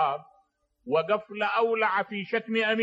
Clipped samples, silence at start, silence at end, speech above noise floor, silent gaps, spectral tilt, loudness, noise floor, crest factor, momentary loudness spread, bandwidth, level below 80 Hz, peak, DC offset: under 0.1%; 0 s; 0 s; 42 dB; none; -6 dB/octave; -27 LUFS; -68 dBFS; 16 dB; 6 LU; 7.8 kHz; -76 dBFS; -12 dBFS; under 0.1%